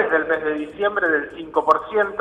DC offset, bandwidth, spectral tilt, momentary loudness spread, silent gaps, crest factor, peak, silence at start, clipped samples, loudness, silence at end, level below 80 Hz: under 0.1%; 9.4 kHz; -5.5 dB/octave; 5 LU; none; 18 dB; -4 dBFS; 0 s; under 0.1%; -21 LUFS; 0 s; -56 dBFS